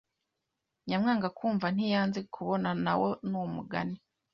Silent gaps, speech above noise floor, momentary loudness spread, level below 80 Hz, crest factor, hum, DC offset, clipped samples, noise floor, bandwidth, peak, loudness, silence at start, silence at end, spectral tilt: none; 54 dB; 7 LU; -68 dBFS; 16 dB; none; under 0.1%; under 0.1%; -85 dBFS; 7 kHz; -16 dBFS; -31 LUFS; 0.85 s; 0.4 s; -7.5 dB/octave